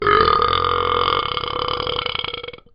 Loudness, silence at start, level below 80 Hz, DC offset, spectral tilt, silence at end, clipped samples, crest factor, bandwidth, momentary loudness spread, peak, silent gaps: -19 LUFS; 0 s; -40 dBFS; under 0.1%; -1 dB/octave; 0.2 s; under 0.1%; 18 dB; 5.6 kHz; 10 LU; 0 dBFS; none